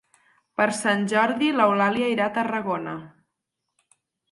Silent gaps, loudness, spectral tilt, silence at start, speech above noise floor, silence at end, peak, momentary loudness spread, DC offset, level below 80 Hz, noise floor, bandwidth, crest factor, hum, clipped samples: none; -22 LUFS; -4.5 dB/octave; 0.6 s; 59 dB; 1.25 s; -6 dBFS; 11 LU; under 0.1%; -70 dBFS; -81 dBFS; 11.5 kHz; 20 dB; none; under 0.1%